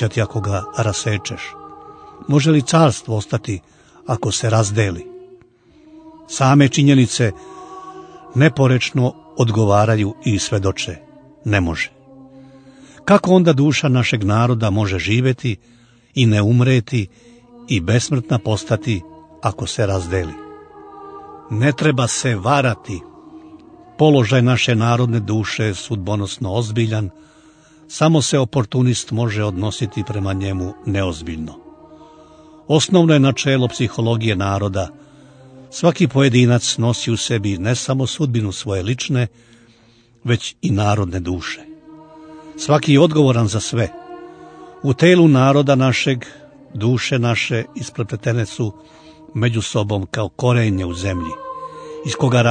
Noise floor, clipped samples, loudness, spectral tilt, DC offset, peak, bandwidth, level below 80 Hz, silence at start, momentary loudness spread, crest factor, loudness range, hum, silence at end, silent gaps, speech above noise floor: -52 dBFS; under 0.1%; -17 LUFS; -5.5 dB/octave; under 0.1%; 0 dBFS; 9.6 kHz; -48 dBFS; 0 s; 16 LU; 18 dB; 5 LU; none; 0 s; none; 35 dB